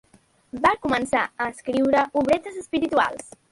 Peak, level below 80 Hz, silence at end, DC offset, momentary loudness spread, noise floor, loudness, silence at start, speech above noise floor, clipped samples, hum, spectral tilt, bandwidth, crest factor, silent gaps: -4 dBFS; -54 dBFS; 0.25 s; under 0.1%; 8 LU; -49 dBFS; -23 LUFS; 0.55 s; 26 dB; under 0.1%; none; -4.5 dB/octave; 11.5 kHz; 18 dB; none